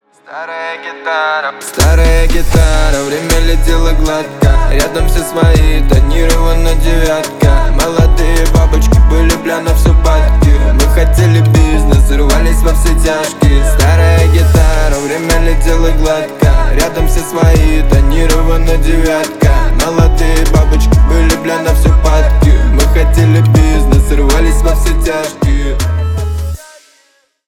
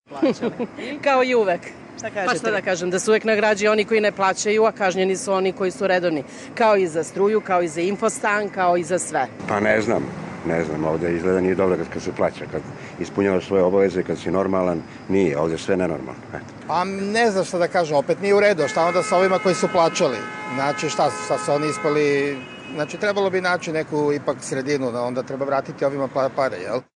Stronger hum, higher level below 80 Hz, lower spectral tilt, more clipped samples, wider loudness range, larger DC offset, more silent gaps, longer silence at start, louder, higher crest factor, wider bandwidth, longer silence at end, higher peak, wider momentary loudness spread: neither; first, -10 dBFS vs -56 dBFS; about the same, -5.5 dB/octave vs -5 dB/octave; neither; about the same, 2 LU vs 4 LU; neither; neither; first, 0.3 s vs 0.1 s; first, -11 LUFS vs -21 LUFS; second, 8 dB vs 16 dB; first, 16 kHz vs 11 kHz; first, 0.9 s vs 0.15 s; first, 0 dBFS vs -6 dBFS; second, 6 LU vs 10 LU